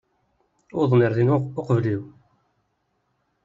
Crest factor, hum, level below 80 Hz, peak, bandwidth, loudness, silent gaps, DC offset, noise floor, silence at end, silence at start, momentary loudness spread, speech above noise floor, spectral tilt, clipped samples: 18 dB; none; -60 dBFS; -6 dBFS; 7.4 kHz; -22 LUFS; none; under 0.1%; -72 dBFS; 1.35 s; 0.75 s; 10 LU; 51 dB; -8.5 dB/octave; under 0.1%